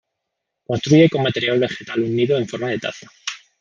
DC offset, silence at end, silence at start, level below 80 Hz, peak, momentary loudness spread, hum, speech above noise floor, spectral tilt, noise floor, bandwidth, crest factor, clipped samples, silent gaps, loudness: under 0.1%; 0.25 s; 0.7 s; -60 dBFS; -2 dBFS; 16 LU; none; 61 dB; -6 dB/octave; -79 dBFS; 7.4 kHz; 18 dB; under 0.1%; none; -19 LUFS